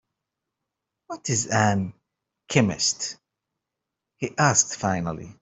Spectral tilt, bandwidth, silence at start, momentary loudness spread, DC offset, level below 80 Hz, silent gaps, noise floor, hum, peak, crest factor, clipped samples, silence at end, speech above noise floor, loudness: -3.5 dB/octave; 8.4 kHz; 1.1 s; 14 LU; under 0.1%; -60 dBFS; none; -85 dBFS; none; -4 dBFS; 24 dB; under 0.1%; 0.1 s; 61 dB; -23 LUFS